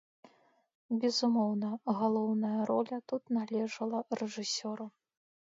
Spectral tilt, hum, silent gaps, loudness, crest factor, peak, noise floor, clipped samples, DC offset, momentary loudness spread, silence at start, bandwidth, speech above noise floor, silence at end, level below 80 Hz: -5 dB/octave; none; none; -33 LUFS; 16 dB; -18 dBFS; -66 dBFS; under 0.1%; under 0.1%; 8 LU; 0.9 s; 7.8 kHz; 33 dB; 0.7 s; -84 dBFS